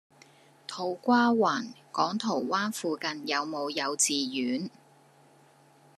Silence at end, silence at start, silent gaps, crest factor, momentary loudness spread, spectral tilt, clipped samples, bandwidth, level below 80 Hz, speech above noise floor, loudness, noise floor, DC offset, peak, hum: 1.3 s; 0.7 s; none; 20 dB; 11 LU; -2.5 dB/octave; under 0.1%; 13.5 kHz; -86 dBFS; 31 dB; -28 LUFS; -59 dBFS; under 0.1%; -10 dBFS; none